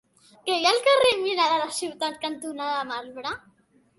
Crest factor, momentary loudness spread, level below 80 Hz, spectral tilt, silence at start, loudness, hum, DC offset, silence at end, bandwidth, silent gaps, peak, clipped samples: 18 dB; 15 LU; -68 dBFS; -1.5 dB/octave; 0.45 s; -24 LUFS; none; under 0.1%; 0.6 s; 12 kHz; none; -8 dBFS; under 0.1%